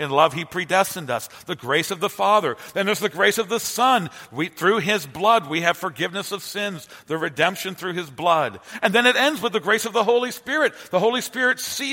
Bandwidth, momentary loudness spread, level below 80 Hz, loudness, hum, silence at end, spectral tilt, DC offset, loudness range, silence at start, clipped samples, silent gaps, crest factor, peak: 16.5 kHz; 10 LU; -66 dBFS; -21 LUFS; none; 0 s; -3 dB/octave; under 0.1%; 3 LU; 0 s; under 0.1%; none; 22 dB; 0 dBFS